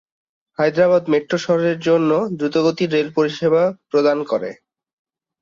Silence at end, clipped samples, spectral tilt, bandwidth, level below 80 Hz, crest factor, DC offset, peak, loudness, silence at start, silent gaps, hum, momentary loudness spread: 0.9 s; under 0.1%; -6.5 dB/octave; 7.6 kHz; -62 dBFS; 14 dB; under 0.1%; -4 dBFS; -18 LUFS; 0.6 s; none; none; 5 LU